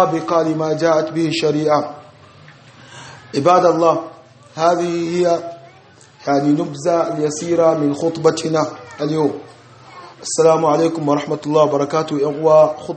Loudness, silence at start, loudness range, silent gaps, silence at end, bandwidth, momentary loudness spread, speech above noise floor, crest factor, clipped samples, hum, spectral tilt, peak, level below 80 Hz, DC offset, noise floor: -17 LUFS; 0 s; 2 LU; none; 0 s; 8.8 kHz; 12 LU; 30 dB; 16 dB; under 0.1%; none; -5.5 dB/octave; 0 dBFS; -64 dBFS; under 0.1%; -46 dBFS